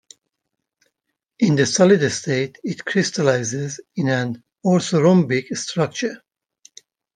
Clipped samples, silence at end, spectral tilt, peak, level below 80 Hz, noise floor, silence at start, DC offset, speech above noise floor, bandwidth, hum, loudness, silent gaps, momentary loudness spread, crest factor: under 0.1%; 1 s; -5 dB/octave; -2 dBFS; -64 dBFS; -79 dBFS; 1.4 s; under 0.1%; 61 dB; 10 kHz; none; -19 LUFS; none; 12 LU; 18 dB